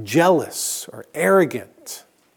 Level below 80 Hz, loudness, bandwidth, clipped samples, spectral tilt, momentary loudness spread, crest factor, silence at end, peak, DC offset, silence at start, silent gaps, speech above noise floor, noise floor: -72 dBFS; -19 LUFS; 19.5 kHz; under 0.1%; -4.5 dB/octave; 19 LU; 18 dB; 0.4 s; -2 dBFS; under 0.1%; 0 s; none; 20 dB; -39 dBFS